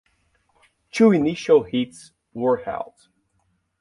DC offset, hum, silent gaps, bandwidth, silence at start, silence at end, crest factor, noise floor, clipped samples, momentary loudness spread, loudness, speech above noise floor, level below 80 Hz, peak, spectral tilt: under 0.1%; none; none; 11.5 kHz; 0.95 s; 0.95 s; 18 dB; -69 dBFS; under 0.1%; 16 LU; -21 LUFS; 49 dB; -60 dBFS; -4 dBFS; -6.5 dB/octave